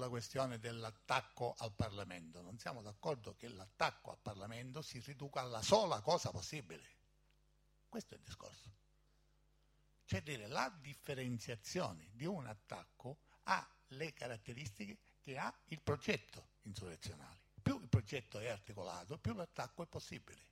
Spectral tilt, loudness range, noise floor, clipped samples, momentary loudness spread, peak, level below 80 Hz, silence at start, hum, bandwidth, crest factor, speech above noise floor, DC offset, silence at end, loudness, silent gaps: -5 dB/octave; 7 LU; -75 dBFS; under 0.1%; 15 LU; -18 dBFS; -68 dBFS; 0 s; none; 16 kHz; 26 dB; 30 dB; under 0.1%; 0.05 s; -44 LUFS; none